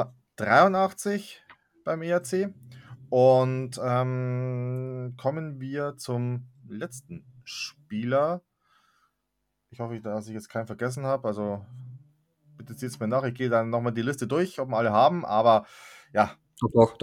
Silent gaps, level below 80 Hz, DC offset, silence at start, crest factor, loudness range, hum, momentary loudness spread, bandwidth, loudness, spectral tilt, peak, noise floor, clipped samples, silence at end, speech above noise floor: none; -66 dBFS; under 0.1%; 0 s; 24 dB; 9 LU; none; 17 LU; 16 kHz; -27 LUFS; -6.5 dB/octave; -4 dBFS; -79 dBFS; under 0.1%; 0.05 s; 53 dB